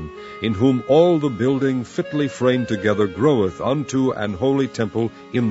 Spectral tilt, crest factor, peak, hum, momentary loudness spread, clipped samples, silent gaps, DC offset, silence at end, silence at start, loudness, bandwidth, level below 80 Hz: -7 dB/octave; 16 dB; -2 dBFS; none; 9 LU; under 0.1%; none; under 0.1%; 0 s; 0 s; -20 LUFS; 8 kHz; -52 dBFS